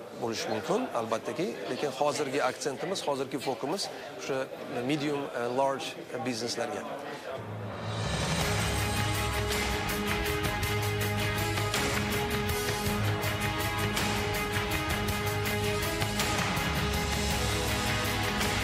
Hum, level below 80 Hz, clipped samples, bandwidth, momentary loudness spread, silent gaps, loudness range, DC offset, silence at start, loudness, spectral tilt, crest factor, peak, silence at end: none; -42 dBFS; under 0.1%; 16 kHz; 6 LU; none; 3 LU; under 0.1%; 0 s; -30 LUFS; -4 dB/octave; 18 dB; -12 dBFS; 0 s